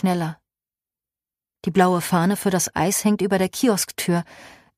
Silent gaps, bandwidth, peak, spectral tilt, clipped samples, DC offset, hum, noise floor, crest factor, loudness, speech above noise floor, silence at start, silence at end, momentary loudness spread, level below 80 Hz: none; 15.5 kHz; -4 dBFS; -5 dB/octave; under 0.1%; under 0.1%; none; under -90 dBFS; 18 dB; -21 LUFS; over 69 dB; 0.05 s; 0.3 s; 7 LU; -58 dBFS